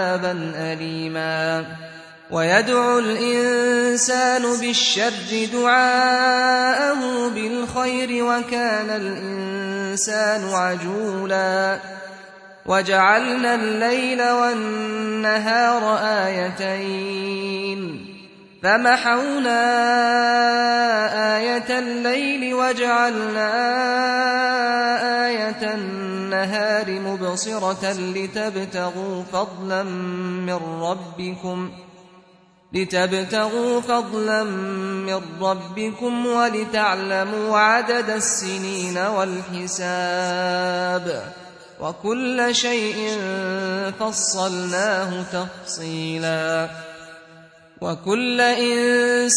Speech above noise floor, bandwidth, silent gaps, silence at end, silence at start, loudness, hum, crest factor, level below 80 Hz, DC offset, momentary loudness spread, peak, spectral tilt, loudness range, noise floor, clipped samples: 33 dB; 11 kHz; none; 0 s; 0 s; -20 LUFS; none; 18 dB; -64 dBFS; under 0.1%; 10 LU; -2 dBFS; -3 dB/octave; 7 LU; -53 dBFS; under 0.1%